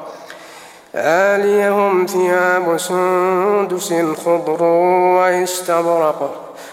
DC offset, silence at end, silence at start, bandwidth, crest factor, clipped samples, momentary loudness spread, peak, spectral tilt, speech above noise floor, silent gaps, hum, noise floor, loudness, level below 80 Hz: under 0.1%; 0 s; 0 s; 16.5 kHz; 14 dB; under 0.1%; 12 LU; -2 dBFS; -4.5 dB/octave; 24 dB; none; none; -39 dBFS; -15 LUFS; -68 dBFS